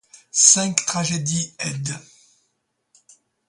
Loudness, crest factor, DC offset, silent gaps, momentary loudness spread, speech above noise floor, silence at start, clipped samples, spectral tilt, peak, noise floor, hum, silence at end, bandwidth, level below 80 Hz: -18 LUFS; 24 dB; under 0.1%; none; 16 LU; 52 dB; 0.35 s; under 0.1%; -2 dB/octave; 0 dBFS; -73 dBFS; none; 1.5 s; 12.5 kHz; -62 dBFS